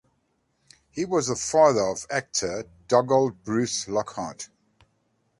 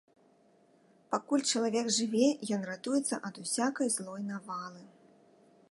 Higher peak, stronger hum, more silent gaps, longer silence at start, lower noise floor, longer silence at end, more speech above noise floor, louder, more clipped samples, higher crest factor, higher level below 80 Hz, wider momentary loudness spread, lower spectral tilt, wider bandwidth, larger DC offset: first, -6 dBFS vs -14 dBFS; neither; neither; second, 0.95 s vs 1.1 s; first, -71 dBFS vs -65 dBFS; about the same, 0.95 s vs 0.85 s; first, 47 dB vs 33 dB; first, -24 LUFS vs -32 LUFS; neither; about the same, 20 dB vs 20 dB; first, -60 dBFS vs -84 dBFS; first, 16 LU vs 11 LU; about the same, -4 dB/octave vs -3 dB/octave; about the same, 11.5 kHz vs 11.5 kHz; neither